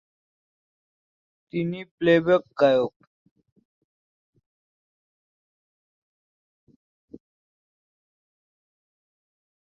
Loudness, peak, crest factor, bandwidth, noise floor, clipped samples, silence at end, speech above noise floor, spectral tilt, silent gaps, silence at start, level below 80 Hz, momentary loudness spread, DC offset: -23 LUFS; -6 dBFS; 22 dB; 7.2 kHz; under -90 dBFS; under 0.1%; 6.85 s; over 68 dB; -7.5 dB/octave; 1.91-1.98 s; 1.55 s; -68 dBFS; 12 LU; under 0.1%